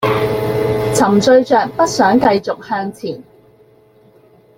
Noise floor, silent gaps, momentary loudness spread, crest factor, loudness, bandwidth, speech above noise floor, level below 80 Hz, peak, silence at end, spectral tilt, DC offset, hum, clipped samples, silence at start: -48 dBFS; none; 13 LU; 14 dB; -14 LUFS; 17 kHz; 35 dB; -46 dBFS; -2 dBFS; 1.35 s; -5 dB/octave; under 0.1%; none; under 0.1%; 0 s